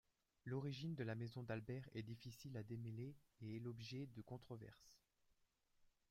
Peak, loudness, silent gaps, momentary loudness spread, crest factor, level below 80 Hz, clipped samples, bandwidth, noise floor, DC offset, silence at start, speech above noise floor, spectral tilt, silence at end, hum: -32 dBFS; -52 LUFS; none; 10 LU; 20 dB; -78 dBFS; under 0.1%; 16 kHz; -82 dBFS; under 0.1%; 0.45 s; 31 dB; -7 dB/octave; 0.2 s; none